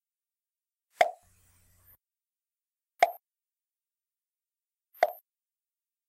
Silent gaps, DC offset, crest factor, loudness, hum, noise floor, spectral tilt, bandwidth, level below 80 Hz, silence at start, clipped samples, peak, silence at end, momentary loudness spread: none; under 0.1%; 28 dB; -29 LUFS; none; under -90 dBFS; -0.5 dB/octave; 16 kHz; -80 dBFS; 1 s; under 0.1%; -8 dBFS; 0.95 s; 16 LU